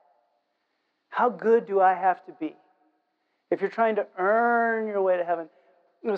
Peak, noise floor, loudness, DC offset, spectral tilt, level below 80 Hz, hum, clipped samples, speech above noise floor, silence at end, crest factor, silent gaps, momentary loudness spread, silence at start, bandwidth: -8 dBFS; -76 dBFS; -25 LUFS; under 0.1%; -7.5 dB/octave; -86 dBFS; none; under 0.1%; 52 dB; 0 s; 18 dB; none; 14 LU; 1.1 s; 5.6 kHz